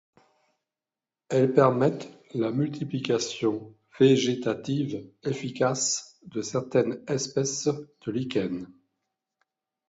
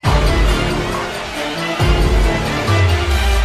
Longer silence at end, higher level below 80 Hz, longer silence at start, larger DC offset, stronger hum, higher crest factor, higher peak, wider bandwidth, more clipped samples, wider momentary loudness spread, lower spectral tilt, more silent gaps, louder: first, 1.2 s vs 0 s; second, -68 dBFS vs -18 dBFS; first, 1.3 s vs 0.05 s; neither; neither; first, 22 dB vs 12 dB; second, -6 dBFS vs -2 dBFS; second, 8 kHz vs 13.5 kHz; neither; first, 13 LU vs 7 LU; about the same, -5 dB/octave vs -5 dB/octave; neither; second, -27 LUFS vs -17 LUFS